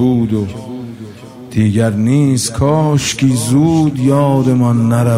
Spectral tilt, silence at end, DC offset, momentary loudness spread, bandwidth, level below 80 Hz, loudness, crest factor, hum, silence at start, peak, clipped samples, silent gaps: -6.5 dB/octave; 0 s; under 0.1%; 15 LU; 16 kHz; -40 dBFS; -13 LUFS; 12 dB; none; 0 s; -2 dBFS; under 0.1%; none